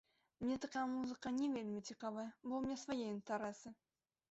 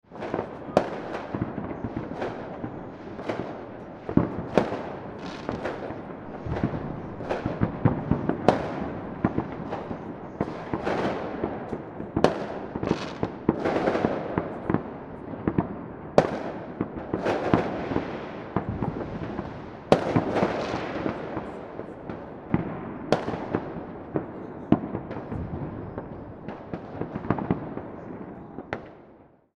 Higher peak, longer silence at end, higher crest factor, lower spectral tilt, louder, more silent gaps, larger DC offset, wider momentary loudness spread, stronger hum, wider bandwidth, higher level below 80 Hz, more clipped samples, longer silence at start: second, -30 dBFS vs 0 dBFS; first, 0.55 s vs 0.35 s; second, 14 dB vs 28 dB; second, -4.5 dB/octave vs -7.5 dB/octave; second, -44 LUFS vs -30 LUFS; neither; neither; second, 6 LU vs 13 LU; neither; second, 8 kHz vs 11.5 kHz; second, -76 dBFS vs -48 dBFS; neither; first, 0.4 s vs 0.1 s